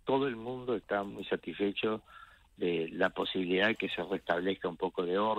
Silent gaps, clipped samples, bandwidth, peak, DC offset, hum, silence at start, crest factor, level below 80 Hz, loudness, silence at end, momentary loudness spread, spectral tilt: none; under 0.1%; 10.5 kHz; -12 dBFS; under 0.1%; none; 0.05 s; 20 dB; -66 dBFS; -33 LUFS; 0 s; 8 LU; -6.5 dB/octave